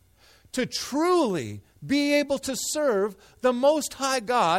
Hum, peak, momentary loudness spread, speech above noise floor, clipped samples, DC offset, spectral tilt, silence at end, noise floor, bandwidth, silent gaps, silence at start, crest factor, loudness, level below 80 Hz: none; -10 dBFS; 9 LU; 33 dB; under 0.1%; under 0.1%; -3.5 dB/octave; 0 s; -57 dBFS; 16 kHz; none; 0.55 s; 16 dB; -25 LUFS; -60 dBFS